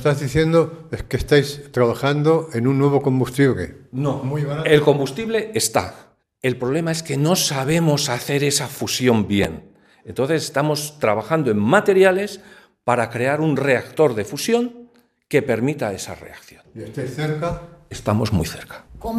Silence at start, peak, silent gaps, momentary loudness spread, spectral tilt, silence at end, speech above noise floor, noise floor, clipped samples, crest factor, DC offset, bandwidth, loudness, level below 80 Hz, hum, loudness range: 0 s; -2 dBFS; none; 13 LU; -5 dB/octave; 0 s; 29 dB; -48 dBFS; under 0.1%; 18 dB; under 0.1%; 15 kHz; -20 LUFS; -44 dBFS; none; 5 LU